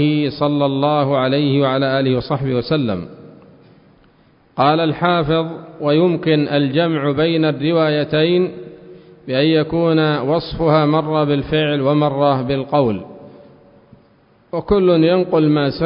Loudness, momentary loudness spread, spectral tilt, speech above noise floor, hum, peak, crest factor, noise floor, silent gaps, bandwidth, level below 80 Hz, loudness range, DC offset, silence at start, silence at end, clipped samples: -16 LUFS; 8 LU; -12 dB/octave; 37 dB; none; -2 dBFS; 16 dB; -53 dBFS; none; 5.4 kHz; -46 dBFS; 4 LU; under 0.1%; 0 s; 0 s; under 0.1%